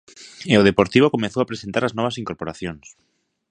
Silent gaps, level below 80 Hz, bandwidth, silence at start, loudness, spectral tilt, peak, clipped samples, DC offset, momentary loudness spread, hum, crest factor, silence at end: none; -50 dBFS; 10 kHz; 0.2 s; -20 LUFS; -6 dB/octave; 0 dBFS; under 0.1%; under 0.1%; 16 LU; none; 20 dB; 0.75 s